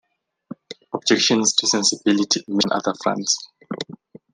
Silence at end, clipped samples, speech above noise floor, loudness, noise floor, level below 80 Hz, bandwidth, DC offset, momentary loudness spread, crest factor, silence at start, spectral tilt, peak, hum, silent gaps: 0.4 s; under 0.1%; 23 dB; -19 LUFS; -43 dBFS; -68 dBFS; 11 kHz; under 0.1%; 17 LU; 22 dB; 0.7 s; -2.5 dB/octave; -2 dBFS; none; none